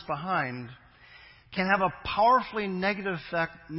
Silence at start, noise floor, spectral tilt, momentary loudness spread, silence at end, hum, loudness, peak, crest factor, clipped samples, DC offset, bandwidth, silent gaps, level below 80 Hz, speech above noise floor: 0 s; -53 dBFS; -9.5 dB/octave; 12 LU; 0 s; none; -27 LUFS; -8 dBFS; 20 dB; under 0.1%; under 0.1%; 5.8 kHz; none; -58 dBFS; 25 dB